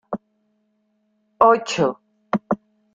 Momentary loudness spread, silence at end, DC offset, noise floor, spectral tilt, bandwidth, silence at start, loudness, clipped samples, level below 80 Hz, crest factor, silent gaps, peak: 17 LU; 0.4 s; under 0.1%; -68 dBFS; -5 dB/octave; 9.2 kHz; 0.1 s; -20 LUFS; under 0.1%; -62 dBFS; 22 dB; none; -2 dBFS